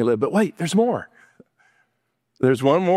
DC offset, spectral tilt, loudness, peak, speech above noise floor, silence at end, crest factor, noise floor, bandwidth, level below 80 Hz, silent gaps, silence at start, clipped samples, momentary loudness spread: under 0.1%; -6.5 dB/octave; -21 LUFS; -4 dBFS; 55 dB; 0 s; 18 dB; -74 dBFS; 15 kHz; -66 dBFS; none; 0 s; under 0.1%; 5 LU